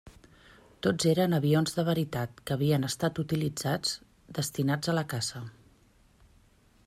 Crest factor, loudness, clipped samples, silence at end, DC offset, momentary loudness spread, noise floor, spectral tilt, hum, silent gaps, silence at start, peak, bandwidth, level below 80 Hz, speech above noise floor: 18 dB; -29 LUFS; under 0.1%; 1.35 s; under 0.1%; 9 LU; -62 dBFS; -5.5 dB/octave; none; none; 0.05 s; -12 dBFS; 15.5 kHz; -60 dBFS; 33 dB